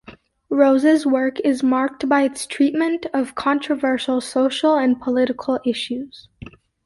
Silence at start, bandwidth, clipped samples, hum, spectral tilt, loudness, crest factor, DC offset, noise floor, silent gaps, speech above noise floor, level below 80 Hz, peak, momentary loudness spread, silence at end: 0.1 s; 11.5 kHz; under 0.1%; none; -4 dB/octave; -19 LUFS; 16 dB; under 0.1%; -41 dBFS; none; 23 dB; -58 dBFS; -4 dBFS; 8 LU; 0.35 s